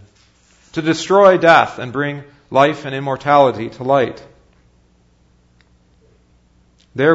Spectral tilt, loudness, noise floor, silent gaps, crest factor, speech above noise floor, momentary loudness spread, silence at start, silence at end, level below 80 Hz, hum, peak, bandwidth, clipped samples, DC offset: -5.5 dB/octave; -15 LUFS; -54 dBFS; none; 18 dB; 40 dB; 13 LU; 0.75 s; 0 s; -56 dBFS; none; 0 dBFS; 8 kHz; under 0.1%; under 0.1%